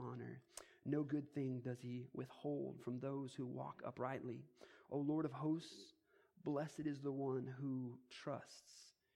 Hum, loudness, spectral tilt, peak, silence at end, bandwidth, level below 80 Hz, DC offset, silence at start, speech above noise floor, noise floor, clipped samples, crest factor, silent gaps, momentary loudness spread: none; -46 LUFS; -7 dB/octave; -28 dBFS; 0.25 s; 13 kHz; -86 dBFS; under 0.1%; 0 s; 22 dB; -68 dBFS; under 0.1%; 18 dB; none; 15 LU